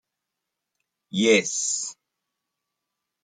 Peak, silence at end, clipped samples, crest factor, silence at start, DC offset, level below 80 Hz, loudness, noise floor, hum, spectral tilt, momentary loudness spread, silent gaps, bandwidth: -6 dBFS; 1.3 s; under 0.1%; 22 dB; 1.15 s; under 0.1%; -74 dBFS; -22 LUFS; -84 dBFS; none; -2.5 dB/octave; 12 LU; none; 9.6 kHz